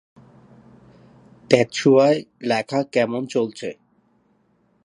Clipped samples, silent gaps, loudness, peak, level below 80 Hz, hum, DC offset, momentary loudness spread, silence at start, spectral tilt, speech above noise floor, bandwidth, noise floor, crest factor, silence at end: under 0.1%; none; -20 LUFS; 0 dBFS; -64 dBFS; none; under 0.1%; 11 LU; 1.5 s; -5.5 dB/octave; 44 dB; 11 kHz; -63 dBFS; 22 dB; 1.1 s